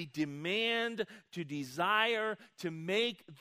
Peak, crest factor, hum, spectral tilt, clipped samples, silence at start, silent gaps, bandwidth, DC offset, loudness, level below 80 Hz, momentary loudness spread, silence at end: -14 dBFS; 20 dB; none; -4.5 dB/octave; under 0.1%; 0 s; none; 15.5 kHz; under 0.1%; -34 LUFS; -82 dBFS; 12 LU; 0.05 s